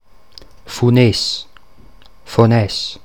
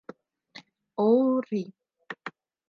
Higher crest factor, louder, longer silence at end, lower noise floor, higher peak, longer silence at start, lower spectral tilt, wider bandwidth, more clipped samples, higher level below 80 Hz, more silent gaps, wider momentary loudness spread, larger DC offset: about the same, 18 dB vs 18 dB; first, -15 LUFS vs -25 LUFS; second, 0.1 s vs 0.4 s; second, -46 dBFS vs -52 dBFS; first, 0 dBFS vs -10 dBFS; second, 0.65 s vs 1 s; second, -6 dB/octave vs -8 dB/octave; first, 15.5 kHz vs 6.6 kHz; neither; first, -46 dBFS vs -86 dBFS; neither; second, 10 LU vs 27 LU; first, 1% vs under 0.1%